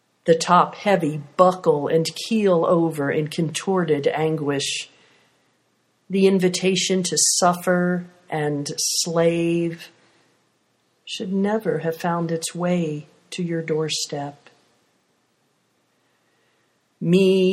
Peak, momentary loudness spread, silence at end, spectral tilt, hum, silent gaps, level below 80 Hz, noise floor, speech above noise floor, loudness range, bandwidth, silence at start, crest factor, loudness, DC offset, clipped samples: 0 dBFS; 12 LU; 0 s; -4.5 dB/octave; none; none; -68 dBFS; -67 dBFS; 46 dB; 9 LU; 15.5 kHz; 0.25 s; 22 dB; -21 LUFS; under 0.1%; under 0.1%